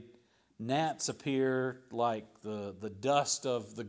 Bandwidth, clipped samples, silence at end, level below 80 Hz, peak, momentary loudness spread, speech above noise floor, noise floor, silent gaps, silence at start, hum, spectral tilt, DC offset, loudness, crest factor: 8 kHz; under 0.1%; 0 s; -72 dBFS; -14 dBFS; 11 LU; 31 dB; -65 dBFS; none; 0 s; none; -4 dB/octave; under 0.1%; -34 LUFS; 20 dB